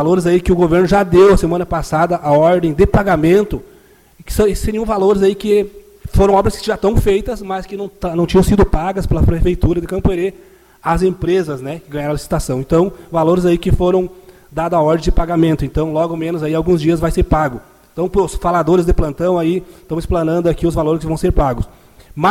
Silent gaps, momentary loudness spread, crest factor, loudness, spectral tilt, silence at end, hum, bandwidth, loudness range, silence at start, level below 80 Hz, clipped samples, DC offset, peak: none; 11 LU; 14 dB; -15 LUFS; -7 dB/octave; 0 s; none; 16 kHz; 4 LU; 0 s; -24 dBFS; under 0.1%; under 0.1%; 0 dBFS